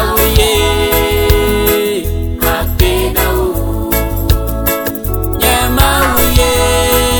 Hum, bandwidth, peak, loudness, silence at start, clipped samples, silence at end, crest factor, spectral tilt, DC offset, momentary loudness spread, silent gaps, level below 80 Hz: none; 20 kHz; 0 dBFS; -12 LUFS; 0 s; under 0.1%; 0 s; 12 dB; -4 dB/octave; 0.3%; 6 LU; none; -16 dBFS